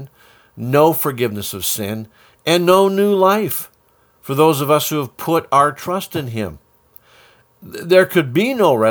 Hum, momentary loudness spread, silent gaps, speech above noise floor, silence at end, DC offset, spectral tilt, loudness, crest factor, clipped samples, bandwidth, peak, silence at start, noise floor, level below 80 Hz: none; 13 LU; none; 40 dB; 0 s; under 0.1%; -5 dB/octave; -16 LUFS; 16 dB; under 0.1%; over 20 kHz; 0 dBFS; 0 s; -56 dBFS; -56 dBFS